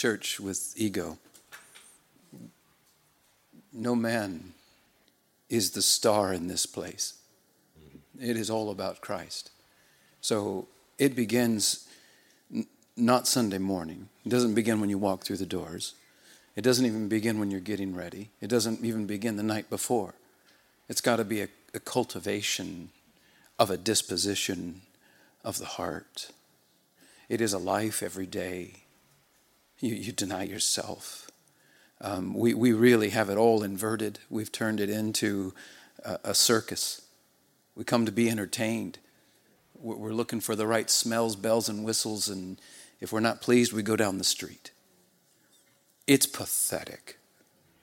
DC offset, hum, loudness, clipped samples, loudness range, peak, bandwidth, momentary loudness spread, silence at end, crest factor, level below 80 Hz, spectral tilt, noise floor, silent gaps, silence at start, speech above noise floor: under 0.1%; none; -28 LUFS; under 0.1%; 8 LU; -6 dBFS; 17 kHz; 17 LU; 0.7 s; 24 dB; -72 dBFS; -3.5 dB/octave; -67 dBFS; none; 0 s; 39 dB